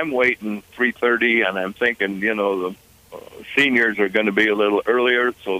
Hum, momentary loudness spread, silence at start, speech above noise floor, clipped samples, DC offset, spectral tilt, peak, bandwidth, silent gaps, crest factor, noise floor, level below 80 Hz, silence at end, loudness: none; 7 LU; 0 s; 21 dB; under 0.1%; under 0.1%; -5 dB/octave; -4 dBFS; 15.5 kHz; none; 16 dB; -41 dBFS; -60 dBFS; 0 s; -19 LUFS